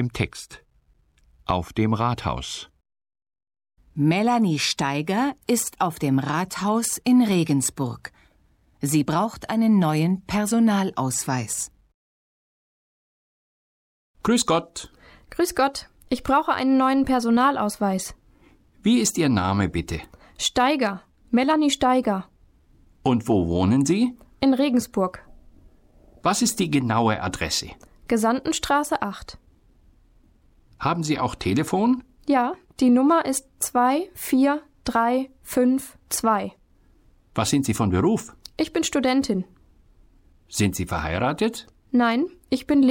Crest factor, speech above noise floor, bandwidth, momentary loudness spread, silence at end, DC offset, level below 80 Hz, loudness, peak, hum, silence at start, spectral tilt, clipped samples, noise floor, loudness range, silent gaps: 14 dB; 40 dB; 17 kHz; 10 LU; 0 s; under 0.1%; -48 dBFS; -23 LUFS; -8 dBFS; none; 0 s; -5 dB/octave; under 0.1%; -62 dBFS; 5 LU; 11.94-14.14 s